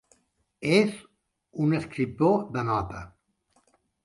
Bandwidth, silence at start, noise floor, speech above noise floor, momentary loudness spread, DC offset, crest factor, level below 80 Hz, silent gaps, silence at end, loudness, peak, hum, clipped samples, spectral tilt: 11.5 kHz; 0.6 s; -70 dBFS; 45 dB; 19 LU; under 0.1%; 20 dB; -54 dBFS; none; 1 s; -26 LUFS; -8 dBFS; none; under 0.1%; -6.5 dB/octave